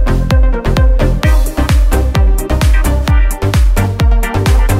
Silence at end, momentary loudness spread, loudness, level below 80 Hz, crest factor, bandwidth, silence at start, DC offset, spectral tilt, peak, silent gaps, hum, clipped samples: 0 s; 1 LU; -13 LUFS; -10 dBFS; 10 dB; 15.5 kHz; 0 s; under 0.1%; -6 dB/octave; 0 dBFS; none; none; under 0.1%